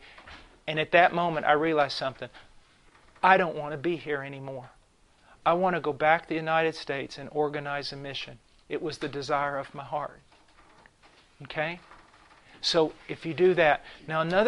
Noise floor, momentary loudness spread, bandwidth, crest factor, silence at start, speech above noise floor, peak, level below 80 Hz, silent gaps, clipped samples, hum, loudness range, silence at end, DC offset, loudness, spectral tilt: -61 dBFS; 16 LU; 11 kHz; 24 dB; 0.05 s; 34 dB; -6 dBFS; -60 dBFS; none; under 0.1%; none; 8 LU; 0 s; under 0.1%; -27 LUFS; -5 dB/octave